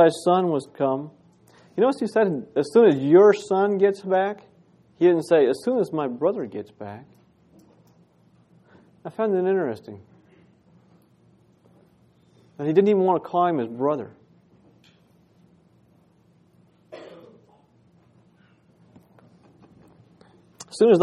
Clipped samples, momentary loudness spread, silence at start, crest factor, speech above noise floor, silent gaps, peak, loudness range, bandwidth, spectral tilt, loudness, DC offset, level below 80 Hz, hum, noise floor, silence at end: under 0.1%; 22 LU; 0 s; 20 dB; 39 dB; none; -4 dBFS; 12 LU; 11.5 kHz; -7 dB/octave; -21 LUFS; under 0.1%; -74 dBFS; none; -59 dBFS; 0 s